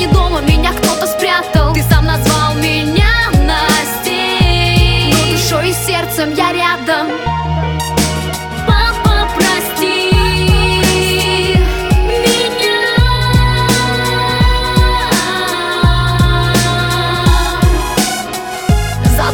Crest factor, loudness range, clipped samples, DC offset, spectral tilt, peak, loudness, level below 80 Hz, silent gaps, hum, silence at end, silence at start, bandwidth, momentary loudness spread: 12 dB; 2 LU; under 0.1%; under 0.1%; -4.5 dB/octave; 0 dBFS; -12 LUFS; -18 dBFS; none; none; 0 s; 0 s; 20 kHz; 4 LU